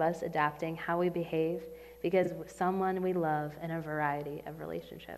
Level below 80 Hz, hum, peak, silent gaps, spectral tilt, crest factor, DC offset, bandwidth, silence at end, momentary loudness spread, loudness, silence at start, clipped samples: -64 dBFS; none; -14 dBFS; none; -7 dB/octave; 20 dB; under 0.1%; 15.5 kHz; 0 s; 10 LU; -34 LUFS; 0 s; under 0.1%